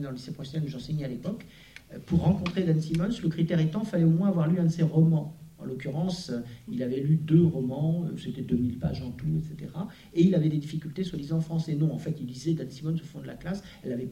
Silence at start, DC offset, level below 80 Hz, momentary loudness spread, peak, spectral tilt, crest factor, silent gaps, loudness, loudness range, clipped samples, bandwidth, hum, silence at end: 0 s; under 0.1%; -52 dBFS; 14 LU; -10 dBFS; -8.5 dB/octave; 18 dB; none; -28 LUFS; 4 LU; under 0.1%; 8.8 kHz; none; 0 s